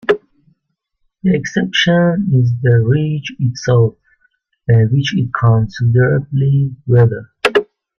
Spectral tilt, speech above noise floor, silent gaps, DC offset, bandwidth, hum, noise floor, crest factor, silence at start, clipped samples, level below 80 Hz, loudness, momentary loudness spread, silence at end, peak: -7 dB/octave; 57 dB; none; under 0.1%; 7 kHz; none; -70 dBFS; 14 dB; 0.1 s; under 0.1%; -46 dBFS; -14 LUFS; 6 LU; 0.35 s; 0 dBFS